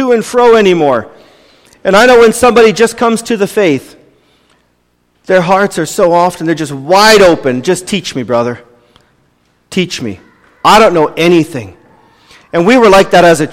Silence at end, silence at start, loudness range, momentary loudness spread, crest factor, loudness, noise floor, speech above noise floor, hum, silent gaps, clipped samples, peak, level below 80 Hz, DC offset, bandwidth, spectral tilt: 0 s; 0 s; 5 LU; 12 LU; 10 dB; -8 LUFS; -56 dBFS; 48 dB; 60 Hz at -40 dBFS; none; 0.3%; 0 dBFS; -40 dBFS; under 0.1%; 16.5 kHz; -4.5 dB/octave